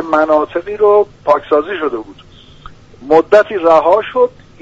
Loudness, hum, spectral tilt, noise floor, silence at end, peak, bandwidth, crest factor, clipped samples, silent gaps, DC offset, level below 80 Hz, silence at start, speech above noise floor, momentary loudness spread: -12 LUFS; none; -6 dB/octave; -37 dBFS; 0.3 s; 0 dBFS; 7.8 kHz; 12 dB; under 0.1%; none; under 0.1%; -46 dBFS; 0 s; 25 dB; 10 LU